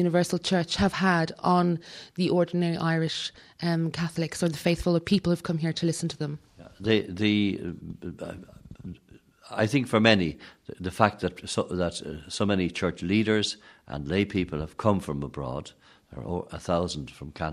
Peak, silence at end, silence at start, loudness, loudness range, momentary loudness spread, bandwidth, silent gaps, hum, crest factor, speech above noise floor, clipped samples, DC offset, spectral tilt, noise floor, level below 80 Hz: -4 dBFS; 0 s; 0 s; -27 LUFS; 4 LU; 16 LU; 14 kHz; none; none; 24 dB; 29 dB; under 0.1%; under 0.1%; -5.5 dB/octave; -55 dBFS; -52 dBFS